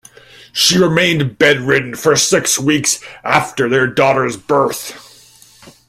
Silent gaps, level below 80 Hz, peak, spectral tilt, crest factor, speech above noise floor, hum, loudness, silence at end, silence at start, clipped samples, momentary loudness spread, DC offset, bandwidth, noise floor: none; -52 dBFS; 0 dBFS; -3 dB/octave; 16 dB; 30 dB; none; -13 LUFS; 0.2 s; 0.55 s; under 0.1%; 7 LU; under 0.1%; 16.5 kHz; -44 dBFS